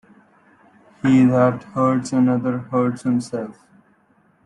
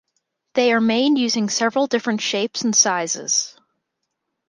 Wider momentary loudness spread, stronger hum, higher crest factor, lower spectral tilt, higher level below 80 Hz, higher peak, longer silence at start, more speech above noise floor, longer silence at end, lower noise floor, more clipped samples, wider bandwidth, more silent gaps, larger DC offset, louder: first, 11 LU vs 6 LU; neither; about the same, 16 dB vs 18 dB; first, -7.5 dB/octave vs -2 dB/octave; first, -62 dBFS vs -70 dBFS; about the same, -4 dBFS vs -2 dBFS; first, 1.05 s vs 0.55 s; second, 40 dB vs 58 dB; about the same, 0.95 s vs 0.95 s; second, -59 dBFS vs -77 dBFS; neither; about the same, 10.5 kHz vs 11 kHz; neither; neither; about the same, -19 LUFS vs -19 LUFS